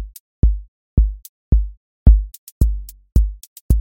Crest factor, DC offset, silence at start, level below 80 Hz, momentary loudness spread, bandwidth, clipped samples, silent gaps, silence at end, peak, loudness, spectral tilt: 16 dB; under 0.1%; 0 s; -18 dBFS; 18 LU; 16.5 kHz; under 0.1%; 0.20-0.42 s, 0.68-0.97 s, 1.29-1.52 s, 1.77-2.06 s, 2.38-2.60 s, 3.47-3.69 s; 0 s; 0 dBFS; -20 LUFS; -8.5 dB/octave